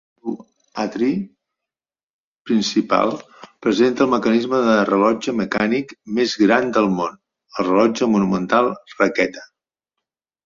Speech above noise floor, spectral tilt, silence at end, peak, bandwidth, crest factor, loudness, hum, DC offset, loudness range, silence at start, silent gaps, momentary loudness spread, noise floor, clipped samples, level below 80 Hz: over 72 dB; -5.5 dB/octave; 1 s; -2 dBFS; 7.4 kHz; 18 dB; -19 LUFS; none; under 0.1%; 5 LU; 0.25 s; 2.03-2.45 s; 13 LU; under -90 dBFS; under 0.1%; -58 dBFS